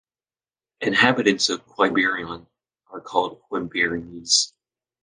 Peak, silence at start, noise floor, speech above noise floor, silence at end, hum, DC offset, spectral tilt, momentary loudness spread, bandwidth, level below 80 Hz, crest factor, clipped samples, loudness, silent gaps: -2 dBFS; 0.8 s; under -90 dBFS; over 68 dB; 0.55 s; none; under 0.1%; -2.5 dB/octave; 15 LU; 10.5 kHz; -60 dBFS; 22 dB; under 0.1%; -21 LUFS; none